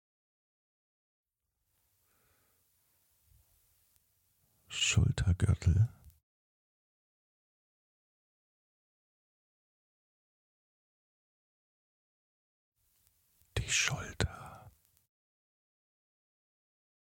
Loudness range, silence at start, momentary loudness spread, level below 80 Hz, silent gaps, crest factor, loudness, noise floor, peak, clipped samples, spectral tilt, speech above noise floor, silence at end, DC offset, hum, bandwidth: 7 LU; 4.7 s; 13 LU; -50 dBFS; 6.23-12.72 s; 28 dB; -32 LUFS; -84 dBFS; -12 dBFS; under 0.1%; -3.5 dB/octave; 54 dB; 2.5 s; under 0.1%; none; 16.5 kHz